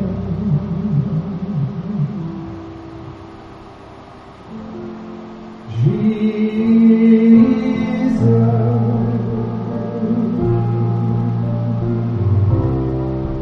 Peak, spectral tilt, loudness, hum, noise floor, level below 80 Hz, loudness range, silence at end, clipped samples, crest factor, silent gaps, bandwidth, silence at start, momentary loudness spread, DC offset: 0 dBFS; -10.5 dB/octave; -17 LUFS; none; -38 dBFS; -38 dBFS; 15 LU; 0 s; under 0.1%; 16 dB; none; 6 kHz; 0 s; 22 LU; under 0.1%